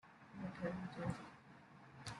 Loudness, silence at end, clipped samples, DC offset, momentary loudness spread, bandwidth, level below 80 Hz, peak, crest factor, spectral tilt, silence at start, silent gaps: -48 LUFS; 0 s; under 0.1%; under 0.1%; 16 LU; 11.5 kHz; -72 dBFS; -30 dBFS; 18 dB; -6.5 dB/octave; 0.05 s; none